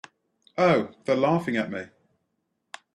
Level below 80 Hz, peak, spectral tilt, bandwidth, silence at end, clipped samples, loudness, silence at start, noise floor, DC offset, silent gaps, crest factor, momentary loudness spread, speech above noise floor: -68 dBFS; -6 dBFS; -7 dB/octave; 11 kHz; 1.1 s; under 0.1%; -24 LUFS; 0.55 s; -77 dBFS; under 0.1%; none; 20 dB; 23 LU; 53 dB